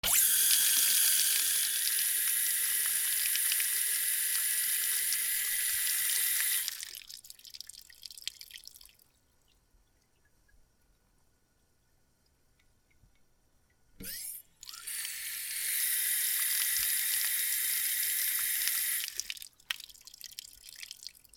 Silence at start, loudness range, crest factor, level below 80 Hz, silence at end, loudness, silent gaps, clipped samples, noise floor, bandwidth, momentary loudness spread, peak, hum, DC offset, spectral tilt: 0.05 s; 21 LU; 24 dB; -68 dBFS; 0.3 s; -28 LUFS; none; under 0.1%; -71 dBFS; over 20 kHz; 22 LU; -10 dBFS; none; under 0.1%; 3.5 dB/octave